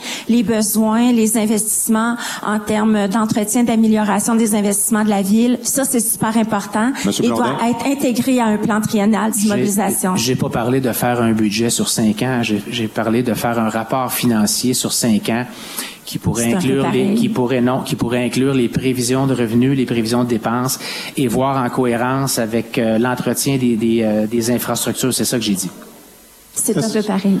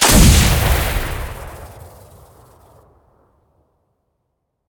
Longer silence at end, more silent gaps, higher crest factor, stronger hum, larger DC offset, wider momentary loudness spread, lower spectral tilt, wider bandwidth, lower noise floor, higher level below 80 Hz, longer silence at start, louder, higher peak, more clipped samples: second, 0 s vs 2.8 s; neither; second, 10 dB vs 18 dB; neither; neither; second, 5 LU vs 26 LU; about the same, -4.5 dB/octave vs -3.5 dB/octave; second, 15 kHz vs 19.5 kHz; second, -44 dBFS vs -72 dBFS; second, -50 dBFS vs -22 dBFS; about the same, 0 s vs 0 s; second, -17 LUFS vs -14 LUFS; second, -6 dBFS vs 0 dBFS; neither